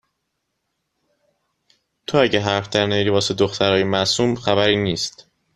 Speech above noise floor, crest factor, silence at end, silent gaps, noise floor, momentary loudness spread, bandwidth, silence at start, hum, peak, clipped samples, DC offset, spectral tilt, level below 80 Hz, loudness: 57 dB; 20 dB; 0.45 s; none; -75 dBFS; 5 LU; 12.5 kHz; 2.1 s; none; 0 dBFS; under 0.1%; under 0.1%; -4.5 dB/octave; -52 dBFS; -19 LUFS